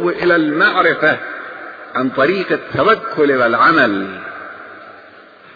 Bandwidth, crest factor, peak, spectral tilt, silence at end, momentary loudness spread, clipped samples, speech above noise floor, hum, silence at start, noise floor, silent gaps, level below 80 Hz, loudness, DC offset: 5 kHz; 14 dB; -2 dBFS; -7 dB/octave; 0.5 s; 19 LU; under 0.1%; 27 dB; none; 0 s; -41 dBFS; none; -56 dBFS; -14 LUFS; under 0.1%